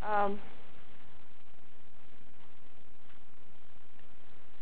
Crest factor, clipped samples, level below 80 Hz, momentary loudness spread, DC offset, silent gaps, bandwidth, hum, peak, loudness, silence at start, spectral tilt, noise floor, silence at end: 24 dB; under 0.1%; -68 dBFS; 26 LU; 4%; none; 4 kHz; none; -18 dBFS; -34 LUFS; 0 s; -8.5 dB/octave; -63 dBFS; 3.8 s